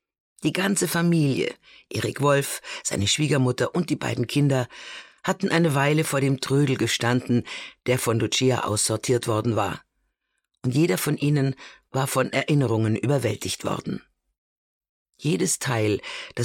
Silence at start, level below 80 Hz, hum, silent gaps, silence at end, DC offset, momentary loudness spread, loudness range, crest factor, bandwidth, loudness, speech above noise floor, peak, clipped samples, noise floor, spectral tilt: 0.4 s; -60 dBFS; none; 14.38-14.81 s, 14.89-15.06 s; 0 s; under 0.1%; 9 LU; 3 LU; 16 dB; 17 kHz; -24 LUFS; 54 dB; -8 dBFS; under 0.1%; -77 dBFS; -5 dB/octave